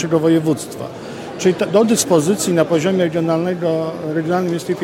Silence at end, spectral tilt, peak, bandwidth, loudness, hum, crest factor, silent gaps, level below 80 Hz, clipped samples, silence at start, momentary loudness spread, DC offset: 0 s; -5.5 dB/octave; 0 dBFS; 16.5 kHz; -17 LUFS; none; 16 dB; none; -58 dBFS; under 0.1%; 0 s; 12 LU; under 0.1%